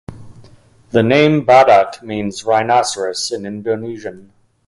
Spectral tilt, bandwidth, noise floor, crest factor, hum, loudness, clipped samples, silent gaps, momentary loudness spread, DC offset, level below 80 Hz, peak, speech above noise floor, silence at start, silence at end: -5 dB/octave; 11.5 kHz; -45 dBFS; 16 dB; none; -14 LUFS; under 0.1%; none; 14 LU; under 0.1%; -52 dBFS; 0 dBFS; 31 dB; 0.1 s; 0.45 s